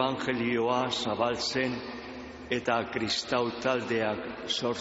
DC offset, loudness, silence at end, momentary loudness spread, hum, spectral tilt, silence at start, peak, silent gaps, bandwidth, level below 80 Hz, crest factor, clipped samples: under 0.1%; -30 LUFS; 0 s; 9 LU; none; -2.5 dB/octave; 0 s; -12 dBFS; none; 8 kHz; -60 dBFS; 18 dB; under 0.1%